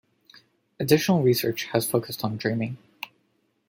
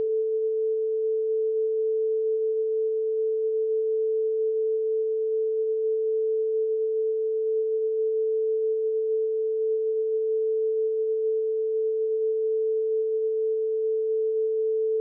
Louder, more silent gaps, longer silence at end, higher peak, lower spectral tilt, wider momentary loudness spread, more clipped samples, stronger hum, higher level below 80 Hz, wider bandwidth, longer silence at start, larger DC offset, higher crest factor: about the same, -24 LUFS vs -26 LUFS; neither; first, 0.65 s vs 0 s; first, -4 dBFS vs -20 dBFS; first, -5.5 dB/octave vs 1 dB/octave; first, 18 LU vs 1 LU; neither; neither; first, -66 dBFS vs under -90 dBFS; first, 17 kHz vs 0.6 kHz; first, 0.8 s vs 0 s; neither; first, 22 dB vs 4 dB